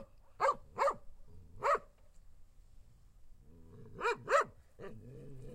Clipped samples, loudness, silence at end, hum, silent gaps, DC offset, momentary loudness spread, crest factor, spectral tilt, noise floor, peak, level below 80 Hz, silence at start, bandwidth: under 0.1%; -35 LUFS; 0 s; none; none; under 0.1%; 21 LU; 24 dB; -4 dB/octave; -58 dBFS; -16 dBFS; -60 dBFS; 0 s; 15.5 kHz